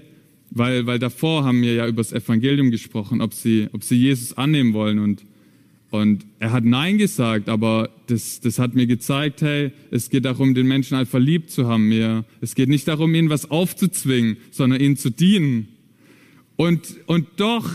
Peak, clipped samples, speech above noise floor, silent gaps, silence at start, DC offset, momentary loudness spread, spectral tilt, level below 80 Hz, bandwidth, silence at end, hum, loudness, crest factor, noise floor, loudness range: -6 dBFS; under 0.1%; 34 dB; none; 0.5 s; under 0.1%; 6 LU; -6 dB/octave; -60 dBFS; 15.5 kHz; 0 s; none; -20 LUFS; 12 dB; -53 dBFS; 2 LU